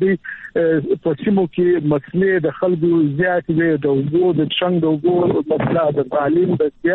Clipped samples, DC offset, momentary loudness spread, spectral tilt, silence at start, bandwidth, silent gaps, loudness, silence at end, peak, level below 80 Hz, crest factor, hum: under 0.1%; under 0.1%; 3 LU; -11 dB/octave; 0 s; 4.1 kHz; none; -17 LUFS; 0 s; -6 dBFS; -52 dBFS; 10 dB; none